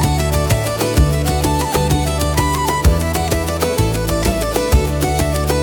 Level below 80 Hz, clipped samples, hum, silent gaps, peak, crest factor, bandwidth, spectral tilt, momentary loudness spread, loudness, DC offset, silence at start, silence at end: -22 dBFS; under 0.1%; none; none; -2 dBFS; 14 dB; 19 kHz; -5 dB/octave; 2 LU; -17 LUFS; under 0.1%; 0 s; 0 s